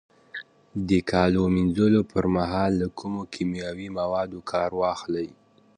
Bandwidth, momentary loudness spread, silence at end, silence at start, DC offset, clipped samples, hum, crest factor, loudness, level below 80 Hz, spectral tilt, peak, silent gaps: 10 kHz; 15 LU; 0.45 s; 0.35 s; under 0.1%; under 0.1%; none; 18 dB; -25 LUFS; -46 dBFS; -7.5 dB/octave; -6 dBFS; none